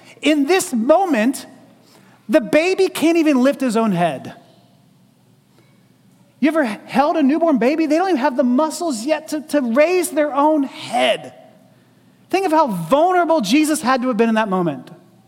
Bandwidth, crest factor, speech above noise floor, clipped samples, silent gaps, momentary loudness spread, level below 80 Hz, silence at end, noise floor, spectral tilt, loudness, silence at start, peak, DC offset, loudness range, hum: 17 kHz; 16 dB; 37 dB; under 0.1%; none; 6 LU; -64 dBFS; 0.35 s; -54 dBFS; -4.5 dB/octave; -17 LUFS; 0.2 s; -2 dBFS; under 0.1%; 4 LU; none